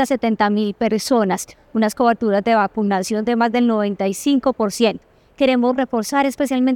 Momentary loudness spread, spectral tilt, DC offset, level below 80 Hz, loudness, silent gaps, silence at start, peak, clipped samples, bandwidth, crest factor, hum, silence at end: 4 LU; -5 dB/octave; under 0.1%; -54 dBFS; -18 LUFS; none; 0 s; -2 dBFS; under 0.1%; 18 kHz; 14 dB; none; 0 s